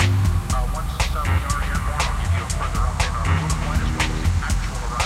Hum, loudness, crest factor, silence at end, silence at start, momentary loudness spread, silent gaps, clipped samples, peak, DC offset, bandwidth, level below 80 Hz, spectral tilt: none; -23 LUFS; 14 dB; 0 s; 0 s; 3 LU; none; under 0.1%; -6 dBFS; under 0.1%; 15.5 kHz; -24 dBFS; -4.5 dB/octave